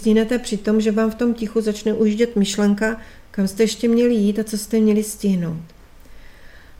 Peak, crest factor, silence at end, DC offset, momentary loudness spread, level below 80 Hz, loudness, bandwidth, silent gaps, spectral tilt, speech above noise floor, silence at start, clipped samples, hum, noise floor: -6 dBFS; 14 dB; 0.05 s; under 0.1%; 7 LU; -44 dBFS; -19 LUFS; 16 kHz; none; -5.5 dB/octave; 23 dB; 0 s; under 0.1%; none; -41 dBFS